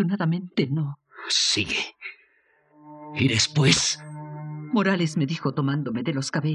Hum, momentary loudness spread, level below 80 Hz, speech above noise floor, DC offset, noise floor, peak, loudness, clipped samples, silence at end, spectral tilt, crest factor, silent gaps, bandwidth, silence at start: none; 17 LU; -56 dBFS; 40 dB; under 0.1%; -63 dBFS; -6 dBFS; -23 LUFS; under 0.1%; 0 s; -4 dB/octave; 20 dB; none; 11.5 kHz; 0 s